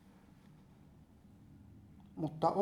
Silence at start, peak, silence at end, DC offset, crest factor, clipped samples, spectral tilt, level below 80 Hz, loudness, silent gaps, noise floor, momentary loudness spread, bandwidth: 1.5 s; -18 dBFS; 0 s; under 0.1%; 24 dB; under 0.1%; -8 dB/octave; -68 dBFS; -38 LUFS; none; -61 dBFS; 26 LU; 15 kHz